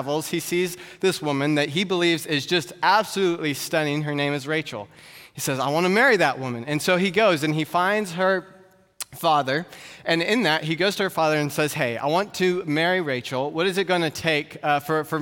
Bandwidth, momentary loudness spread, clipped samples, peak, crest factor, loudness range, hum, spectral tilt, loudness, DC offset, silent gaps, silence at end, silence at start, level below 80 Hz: 17.5 kHz; 7 LU; under 0.1%; -6 dBFS; 18 dB; 2 LU; none; -4.5 dB/octave; -22 LUFS; under 0.1%; none; 0 s; 0 s; -68 dBFS